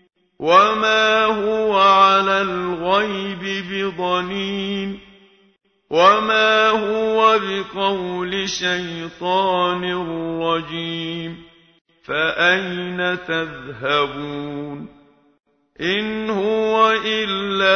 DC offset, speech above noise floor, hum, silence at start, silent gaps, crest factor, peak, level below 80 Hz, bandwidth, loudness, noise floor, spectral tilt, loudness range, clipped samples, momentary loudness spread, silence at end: under 0.1%; 32 dB; none; 0.4 s; 11.81-11.85 s; 18 dB; 0 dBFS; -54 dBFS; 6.6 kHz; -18 LUFS; -51 dBFS; -4 dB/octave; 7 LU; under 0.1%; 13 LU; 0 s